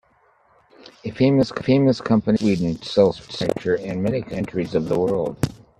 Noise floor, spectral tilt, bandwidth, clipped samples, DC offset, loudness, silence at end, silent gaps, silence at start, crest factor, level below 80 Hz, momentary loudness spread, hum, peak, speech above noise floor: -59 dBFS; -7.5 dB/octave; 13.5 kHz; under 0.1%; under 0.1%; -21 LUFS; 0.25 s; none; 1.05 s; 18 dB; -50 dBFS; 8 LU; none; -2 dBFS; 39 dB